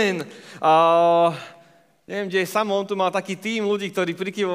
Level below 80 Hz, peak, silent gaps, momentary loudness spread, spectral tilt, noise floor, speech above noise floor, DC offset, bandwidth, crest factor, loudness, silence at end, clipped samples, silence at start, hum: -80 dBFS; -6 dBFS; none; 14 LU; -5 dB/octave; -55 dBFS; 34 dB; under 0.1%; 16 kHz; 16 dB; -21 LUFS; 0 s; under 0.1%; 0 s; none